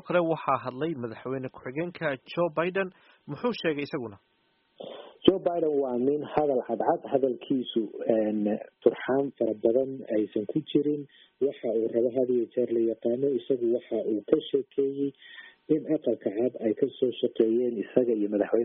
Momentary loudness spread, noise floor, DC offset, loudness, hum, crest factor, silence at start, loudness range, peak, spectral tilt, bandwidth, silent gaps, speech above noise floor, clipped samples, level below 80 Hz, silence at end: 9 LU; -51 dBFS; under 0.1%; -28 LUFS; none; 24 dB; 0.05 s; 4 LU; -4 dBFS; -5 dB/octave; 4.5 kHz; none; 24 dB; under 0.1%; -68 dBFS; 0 s